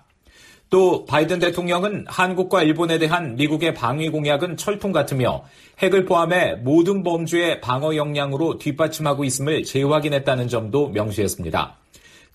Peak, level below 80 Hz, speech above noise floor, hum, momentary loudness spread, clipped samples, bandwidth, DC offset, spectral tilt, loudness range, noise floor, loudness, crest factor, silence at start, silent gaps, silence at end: -6 dBFS; -52 dBFS; 31 dB; none; 6 LU; under 0.1%; 15 kHz; under 0.1%; -5.5 dB/octave; 2 LU; -51 dBFS; -20 LUFS; 16 dB; 0.7 s; none; 0.65 s